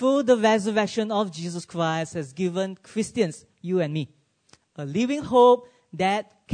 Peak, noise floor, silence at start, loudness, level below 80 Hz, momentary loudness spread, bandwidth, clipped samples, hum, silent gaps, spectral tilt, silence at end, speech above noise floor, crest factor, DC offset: -6 dBFS; -60 dBFS; 0 s; -24 LUFS; -64 dBFS; 14 LU; 9.6 kHz; under 0.1%; none; none; -5.5 dB/octave; 0 s; 37 dB; 18 dB; under 0.1%